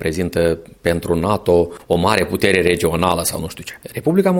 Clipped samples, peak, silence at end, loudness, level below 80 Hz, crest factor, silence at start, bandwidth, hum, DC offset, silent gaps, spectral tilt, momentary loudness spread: under 0.1%; 0 dBFS; 0 s; -17 LUFS; -40 dBFS; 18 dB; 0 s; 17 kHz; none; under 0.1%; none; -5 dB/octave; 8 LU